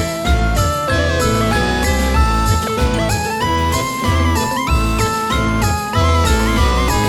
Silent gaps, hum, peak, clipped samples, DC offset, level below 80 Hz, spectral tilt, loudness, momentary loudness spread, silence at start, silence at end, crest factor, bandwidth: none; none; -2 dBFS; under 0.1%; under 0.1%; -20 dBFS; -5 dB/octave; -16 LUFS; 3 LU; 0 s; 0 s; 14 dB; 19 kHz